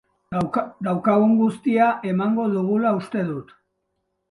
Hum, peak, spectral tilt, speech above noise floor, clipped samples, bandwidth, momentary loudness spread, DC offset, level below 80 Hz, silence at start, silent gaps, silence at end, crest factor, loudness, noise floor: none; -6 dBFS; -8.5 dB/octave; 54 dB; under 0.1%; 11 kHz; 9 LU; under 0.1%; -60 dBFS; 0.3 s; none; 0.9 s; 16 dB; -21 LUFS; -75 dBFS